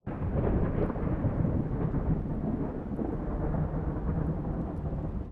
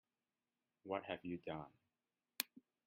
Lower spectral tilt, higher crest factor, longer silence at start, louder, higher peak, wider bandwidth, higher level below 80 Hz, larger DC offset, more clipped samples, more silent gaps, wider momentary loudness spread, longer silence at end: first, -12 dB/octave vs -3 dB/octave; second, 14 dB vs 32 dB; second, 0.05 s vs 0.85 s; first, -32 LUFS vs -47 LUFS; about the same, -16 dBFS vs -18 dBFS; second, 3.7 kHz vs 5.4 kHz; first, -36 dBFS vs -82 dBFS; neither; neither; neither; second, 5 LU vs 11 LU; second, 0 s vs 0.3 s